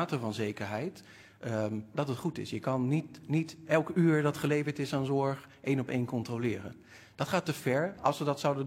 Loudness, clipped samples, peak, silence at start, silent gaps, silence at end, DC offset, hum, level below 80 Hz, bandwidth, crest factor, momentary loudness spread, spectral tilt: -32 LUFS; under 0.1%; -12 dBFS; 0 s; none; 0 s; under 0.1%; none; -70 dBFS; 16 kHz; 20 dB; 9 LU; -6.5 dB/octave